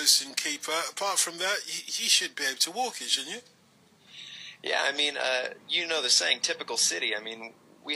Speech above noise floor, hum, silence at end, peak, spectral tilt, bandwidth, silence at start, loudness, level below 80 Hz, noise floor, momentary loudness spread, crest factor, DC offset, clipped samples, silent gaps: 32 dB; none; 0 s; -6 dBFS; 1.5 dB/octave; 15.5 kHz; 0 s; -26 LUFS; under -90 dBFS; -61 dBFS; 18 LU; 24 dB; under 0.1%; under 0.1%; none